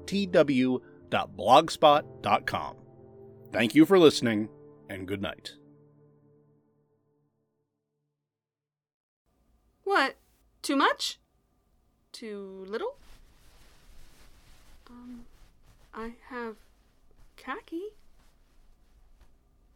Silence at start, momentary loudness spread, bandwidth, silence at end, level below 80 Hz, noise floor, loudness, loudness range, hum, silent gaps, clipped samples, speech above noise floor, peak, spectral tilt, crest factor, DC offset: 0 s; 23 LU; 18.5 kHz; 1.85 s; -62 dBFS; under -90 dBFS; -26 LUFS; 21 LU; none; 8.94-9.25 s; under 0.1%; over 64 dB; -4 dBFS; -5 dB/octave; 26 dB; under 0.1%